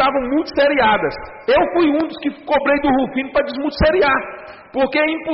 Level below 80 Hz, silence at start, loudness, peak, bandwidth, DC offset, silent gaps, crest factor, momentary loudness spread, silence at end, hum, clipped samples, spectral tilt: -38 dBFS; 0 s; -17 LUFS; -6 dBFS; 6 kHz; under 0.1%; none; 12 dB; 10 LU; 0 s; none; under 0.1%; -3 dB/octave